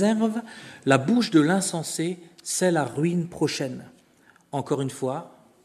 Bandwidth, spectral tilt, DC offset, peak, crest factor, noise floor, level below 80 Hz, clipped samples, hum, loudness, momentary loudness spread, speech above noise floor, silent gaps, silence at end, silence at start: 13.5 kHz; -5 dB/octave; under 0.1%; -2 dBFS; 22 dB; -58 dBFS; -68 dBFS; under 0.1%; none; -25 LUFS; 14 LU; 34 dB; none; 0.35 s; 0 s